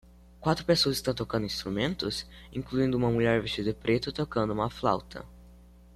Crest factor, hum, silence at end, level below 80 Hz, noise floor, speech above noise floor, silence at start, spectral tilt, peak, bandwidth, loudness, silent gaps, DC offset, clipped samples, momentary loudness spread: 20 dB; none; 0.4 s; -50 dBFS; -53 dBFS; 24 dB; 0.4 s; -5.5 dB/octave; -10 dBFS; 14 kHz; -29 LUFS; none; under 0.1%; under 0.1%; 8 LU